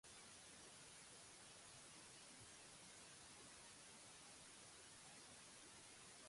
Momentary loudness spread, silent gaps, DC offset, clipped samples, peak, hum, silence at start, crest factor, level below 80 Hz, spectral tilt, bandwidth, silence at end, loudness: 0 LU; none; under 0.1%; under 0.1%; -50 dBFS; none; 0.05 s; 14 dB; -84 dBFS; -1.5 dB/octave; 11.5 kHz; 0 s; -60 LUFS